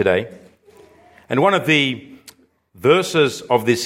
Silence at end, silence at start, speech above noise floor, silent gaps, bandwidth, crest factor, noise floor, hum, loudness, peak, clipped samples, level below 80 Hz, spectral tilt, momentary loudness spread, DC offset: 0 s; 0 s; 32 dB; none; 16.5 kHz; 18 dB; -49 dBFS; none; -17 LUFS; -2 dBFS; under 0.1%; -62 dBFS; -4.5 dB/octave; 8 LU; under 0.1%